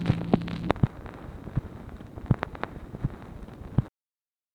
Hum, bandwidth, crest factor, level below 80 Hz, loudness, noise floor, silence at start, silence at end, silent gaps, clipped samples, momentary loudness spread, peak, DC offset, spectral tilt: none; 10 kHz; 30 dB; -42 dBFS; -30 LUFS; under -90 dBFS; 0 s; 0.65 s; none; under 0.1%; 16 LU; 0 dBFS; under 0.1%; -9 dB/octave